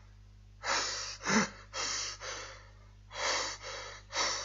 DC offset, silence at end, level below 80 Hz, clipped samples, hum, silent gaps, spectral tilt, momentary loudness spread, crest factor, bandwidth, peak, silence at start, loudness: under 0.1%; 0 s; -58 dBFS; under 0.1%; 50 Hz at -55 dBFS; none; -1.5 dB/octave; 13 LU; 22 dB; 8.2 kHz; -14 dBFS; 0 s; -34 LUFS